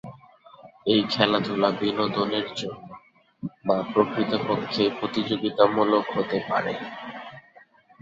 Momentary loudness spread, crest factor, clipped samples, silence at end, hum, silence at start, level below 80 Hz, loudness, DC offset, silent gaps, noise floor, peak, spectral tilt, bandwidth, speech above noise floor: 17 LU; 24 dB; under 0.1%; 0.6 s; none; 0.05 s; -62 dBFS; -24 LUFS; under 0.1%; none; -54 dBFS; -2 dBFS; -6 dB/octave; 7.8 kHz; 31 dB